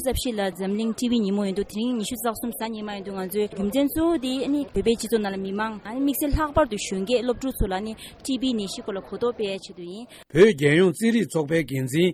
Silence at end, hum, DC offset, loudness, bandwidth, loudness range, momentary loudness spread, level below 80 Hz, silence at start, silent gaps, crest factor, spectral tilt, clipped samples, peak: 0 s; none; under 0.1%; -24 LUFS; 16.5 kHz; 4 LU; 12 LU; -40 dBFS; 0 s; none; 18 dB; -5.5 dB/octave; under 0.1%; -6 dBFS